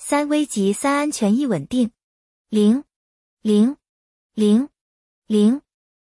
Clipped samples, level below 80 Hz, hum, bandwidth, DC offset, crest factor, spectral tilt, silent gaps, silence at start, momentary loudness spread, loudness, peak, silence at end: under 0.1%; -62 dBFS; none; 12 kHz; under 0.1%; 14 dB; -5.5 dB/octave; 2.04-2.45 s, 2.96-3.37 s, 3.89-4.30 s, 4.81-5.22 s; 0 s; 9 LU; -20 LUFS; -6 dBFS; 0.5 s